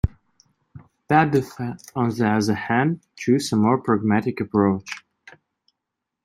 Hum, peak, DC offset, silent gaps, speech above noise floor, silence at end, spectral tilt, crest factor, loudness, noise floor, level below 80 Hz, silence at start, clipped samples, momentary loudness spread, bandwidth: none; -2 dBFS; under 0.1%; none; 62 dB; 1.25 s; -6.5 dB/octave; 20 dB; -22 LUFS; -83 dBFS; -42 dBFS; 0.05 s; under 0.1%; 10 LU; 13.5 kHz